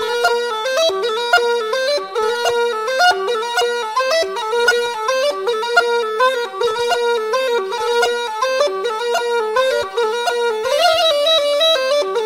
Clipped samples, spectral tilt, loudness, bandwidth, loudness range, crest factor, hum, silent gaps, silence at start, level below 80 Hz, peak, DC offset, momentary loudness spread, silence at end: under 0.1%; 0 dB/octave; -17 LUFS; 16.5 kHz; 2 LU; 16 dB; none; none; 0 s; -64 dBFS; 0 dBFS; 0.1%; 5 LU; 0 s